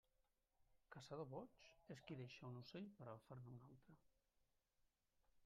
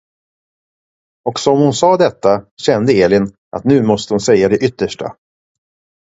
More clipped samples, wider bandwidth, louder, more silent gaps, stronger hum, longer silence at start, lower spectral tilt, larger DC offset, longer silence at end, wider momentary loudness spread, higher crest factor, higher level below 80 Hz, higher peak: neither; second, 7 kHz vs 8 kHz; second, -58 LUFS vs -14 LUFS; second, none vs 2.51-2.57 s, 3.38-3.51 s; neither; second, 0.6 s vs 1.25 s; about the same, -6 dB/octave vs -5.5 dB/octave; neither; second, 0 s vs 0.9 s; about the same, 9 LU vs 11 LU; first, 20 dB vs 14 dB; second, -84 dBFS vs -48 dBFS; second, -42 dBFS vs 0 dBFS